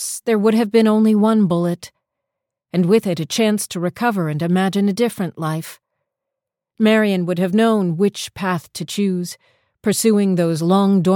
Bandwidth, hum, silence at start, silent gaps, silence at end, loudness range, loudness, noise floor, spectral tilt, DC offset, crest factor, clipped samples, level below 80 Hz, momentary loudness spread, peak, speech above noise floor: 17.5 kHz; none; 0 s; none; 0 s; 3 LU; -18 LUFS; -83 dBFS; -6 dB/octave; under 0.1%; 14 dB; under 0.1%; -62 dBFS; 10 LU; -4 dBFS; 66 dB